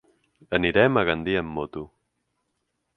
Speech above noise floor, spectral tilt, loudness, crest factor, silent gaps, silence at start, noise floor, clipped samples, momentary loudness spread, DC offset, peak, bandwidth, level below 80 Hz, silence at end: 54 dB; -8 dB/octave; -23 LUFS; 24 dB; none; 0.5 s; -77 dBFS; under 0.1%; 17 LU; under 0.1%; -2 dBFS; 5.8 kHz; -50 dBFS; 1.1 s